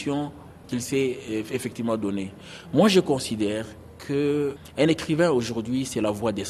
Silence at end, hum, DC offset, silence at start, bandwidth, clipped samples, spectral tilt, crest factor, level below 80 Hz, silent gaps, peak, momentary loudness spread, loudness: 0 s; none; under 0.1%; 0 s; 13.5 kHz; under 0.1%; -5.5 dB/octave; 18 dB; -54 dBFS; none; -8 dBFS; 12 LU; -25 LUFS